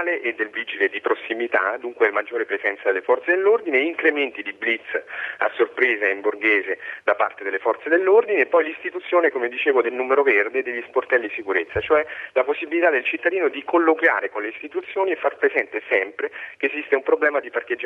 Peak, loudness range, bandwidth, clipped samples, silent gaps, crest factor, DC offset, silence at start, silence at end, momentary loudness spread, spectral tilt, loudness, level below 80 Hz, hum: -4 dBFS; 2 LU; 4.8 kHz; under 0.1%; none; 18 dB; under 0.1%; 0 s; 0 s; 8 LU; -6 dB/octave; -21 LUFS; -62 dBFS; none